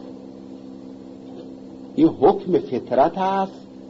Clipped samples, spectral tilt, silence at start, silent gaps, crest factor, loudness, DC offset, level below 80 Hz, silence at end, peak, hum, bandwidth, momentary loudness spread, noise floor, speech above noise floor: under 0.1%; -8.5 dB/octave; 0 s; none; 18 dB; -20 LUFS; under 0.1%; -58 dBFS; 0 s; -6 dBFS; none; 7.2 kHz; 22 LU; -38 dBFS; 20 dB